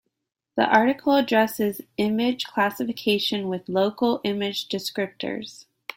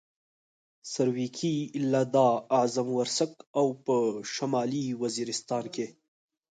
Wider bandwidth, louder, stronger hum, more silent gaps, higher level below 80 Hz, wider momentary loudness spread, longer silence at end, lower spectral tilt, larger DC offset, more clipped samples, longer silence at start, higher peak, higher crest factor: first, 16.5 kHz vs 9.4 kHz; first, -24 LUFS vs -29 LUFS; neither; second, none vs 3.47-3.54 s; first, -66 dBFS vs -76 dBFS; about the same, 11 LU vs 9 LU; second, 0.35 s vs 0.6 s; about the same, -4.5 dB/octave vs -5 dB/octave; neither; neither; second, 0.55 s vs 0.85 s; first, -4 dBFS vs -10 dBFS; about the same, 20 dB vs 18 dB